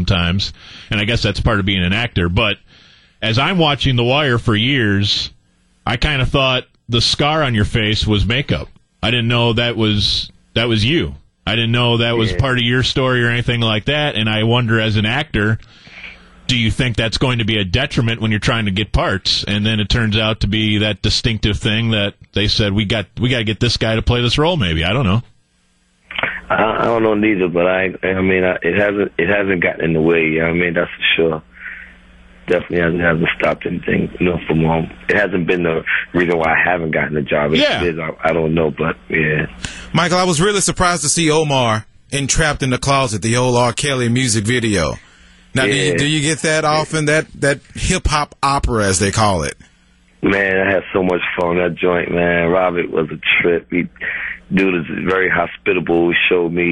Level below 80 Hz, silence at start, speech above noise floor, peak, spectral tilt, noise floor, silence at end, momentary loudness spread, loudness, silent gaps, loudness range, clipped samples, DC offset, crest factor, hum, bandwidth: -32 dBFS; 0 s; 43 dB; -2 dBFS; -4.5 dB/octave; -59 dBFS; 0 s; 6 LU; -16 LUFS; none; 2 LU; under 0.1%; under 0.1%; 14 dB; none; 11.5 kHz